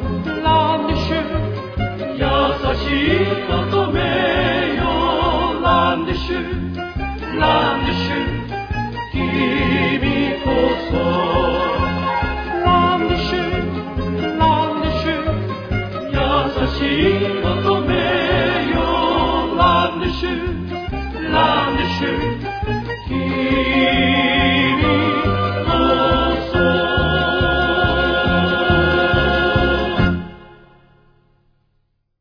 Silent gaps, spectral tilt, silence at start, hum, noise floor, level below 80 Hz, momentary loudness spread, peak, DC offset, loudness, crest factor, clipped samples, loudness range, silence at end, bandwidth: none; -7.5 dB/octave; 0 s; none; -65 dBFS; -30 dBFS; 8 LU; -2 dBFS; under 0.1%; -18 LUFS; 16 dB; under 0.1%; 4 LU; 1.65 s; 5.4 kHz